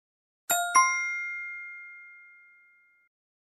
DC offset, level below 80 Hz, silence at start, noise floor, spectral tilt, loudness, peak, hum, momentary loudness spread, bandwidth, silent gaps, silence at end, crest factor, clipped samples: under 0.1%; -78 dBFS; 0.5 s; -62 dBFS; 2 dB/octave; -26 LUFS; -8 dBFS; none; 23 LU; 15 kHz; none; 1.3 s; 22 dB; under 0.1%